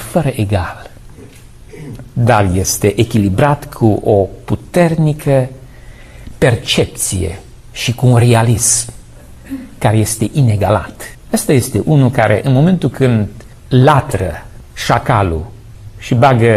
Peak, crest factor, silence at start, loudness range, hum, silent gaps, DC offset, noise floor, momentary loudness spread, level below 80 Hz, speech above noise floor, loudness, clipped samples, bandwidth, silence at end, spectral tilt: 0 dBFS; 14 dB; 0 s; 3 LU; none; none; under 0.1%; -36 dBFS; 17 LU; -34 dBFS; 24 dB; -13 LUFS; under 0.1%; 14 kHz; 0 s; -5.5 dB/octave